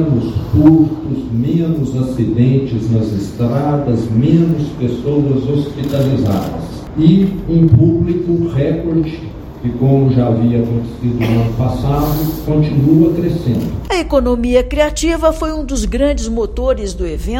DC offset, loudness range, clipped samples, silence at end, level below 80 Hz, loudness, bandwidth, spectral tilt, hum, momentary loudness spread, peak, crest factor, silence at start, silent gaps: under 0.1%; 2 LU; 0.1%; 0 s; -26 dBFS; -14 LUFS; 17 kHz; -7.5 dB/octave; none; 8 LU; 0 dBFS; 14 dB; 0 s; none